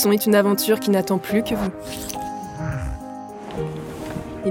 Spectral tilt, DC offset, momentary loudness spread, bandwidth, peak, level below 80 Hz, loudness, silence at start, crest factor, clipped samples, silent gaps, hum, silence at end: -5 dB/octave; under 0.1%; 15 LU; 17 kHz; -6 dBFS; -42 dBFS; -23 LUFS; 0 s; 16 dB; under 0.1%; none; none; 0 s